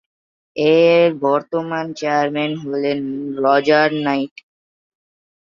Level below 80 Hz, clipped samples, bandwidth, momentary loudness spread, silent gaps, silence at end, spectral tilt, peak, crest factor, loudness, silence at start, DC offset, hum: -66 dBFS; under 0.1%; 7.2 kHz; 10 LU; none; 1.15 s; -6 dB/octave; -2 dBFS; 16 dB; -17 LUFS; 0.55 s; under 0.1%; none